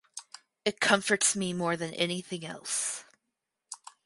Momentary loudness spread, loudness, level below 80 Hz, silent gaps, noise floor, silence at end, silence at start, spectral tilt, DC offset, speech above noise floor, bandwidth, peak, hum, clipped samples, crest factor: 20 LU; -29 LUFS; -72 dBFS; none; -85 dBFS; 0.3 s; 0.15 s; -2.5 dB/octave; under 0.1%; 55 dB; 12 kHz; -8 dBFS; none; under 0.1%; 24 dB